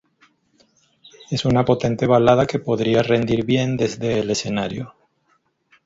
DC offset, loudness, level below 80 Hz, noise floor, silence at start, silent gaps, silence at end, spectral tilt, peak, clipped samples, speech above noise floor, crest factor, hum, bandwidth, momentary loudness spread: under 0.1%; -19 LUFS; -48 dBFS; -65 dBFS; 1.3 s; none; 0.95 s; -6 dB/octave; -2 dBFS; under 0.1%; 46 dB; 18 dB; none; 8 kHz; 9 LU